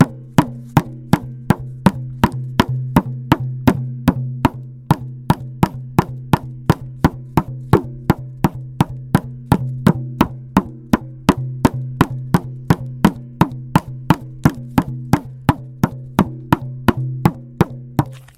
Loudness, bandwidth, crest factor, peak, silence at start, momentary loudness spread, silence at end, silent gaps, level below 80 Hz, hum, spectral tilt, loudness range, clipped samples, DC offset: -19 LUFS; 17 kHz; 18 dB; 0 dBFS; 0 s; 4 LU; 0.15 s; none; -36 dBFS; none; -7 dB/octave; 1 LU; under 0.1%; under 0.1%